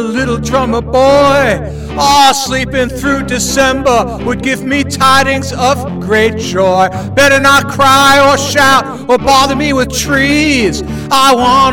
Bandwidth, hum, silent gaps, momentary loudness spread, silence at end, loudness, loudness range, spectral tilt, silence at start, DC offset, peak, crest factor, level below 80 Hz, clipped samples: 19.5 kHz; none; none; 8 LU; 0 s; -9 LUFS; 3 LU; -3.5 dB/octave; 0 s; under 0.1%; 0 dBFS; 10 dB; -30 dBFS; under 0.1%